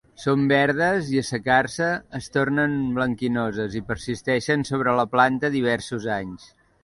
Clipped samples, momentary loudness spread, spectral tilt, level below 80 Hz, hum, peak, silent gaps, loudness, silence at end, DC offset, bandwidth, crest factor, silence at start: under 0.1%; 9 LU; -5.5 dB/octave; -52 dBFS; none; -4 dBFS; none; -23 LUFS; 0.4 s; under 0.1%; 11.5 kHz; 18 dB; 0.2 s